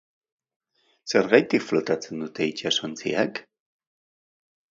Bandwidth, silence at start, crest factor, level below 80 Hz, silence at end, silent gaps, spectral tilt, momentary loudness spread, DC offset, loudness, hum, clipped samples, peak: 7.8 kHz; 1.05 s; 26 dB; -70 dBFS; 1.3 s; none; -4 dB/octave; 11 LU; under 0.1%; -24 LUFS; none; under 0.1%; -2 dBFS